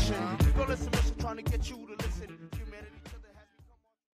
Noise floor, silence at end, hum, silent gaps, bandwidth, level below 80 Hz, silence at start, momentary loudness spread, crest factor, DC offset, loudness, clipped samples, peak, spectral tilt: -61 dBFS; 0.55 s; none; none; 15.5 kHz; -36 dBFS; 0 s; 20 LU; 16 dB; under 0.1%; -33 LUFS; under 0.1%; -16 dBFS; -5.5 dB/octave